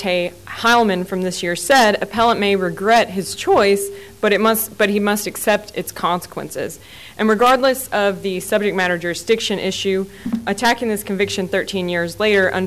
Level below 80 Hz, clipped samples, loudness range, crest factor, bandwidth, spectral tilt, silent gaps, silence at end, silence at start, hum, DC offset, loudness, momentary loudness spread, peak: -50 dBFS; under 0.1%; 3 LU; 12 dB; 16 kHz; -4 dB/octave; none; 0 s; 0 s; none; 0.3%; -18 LUFS; 10 LU; -6 dBFS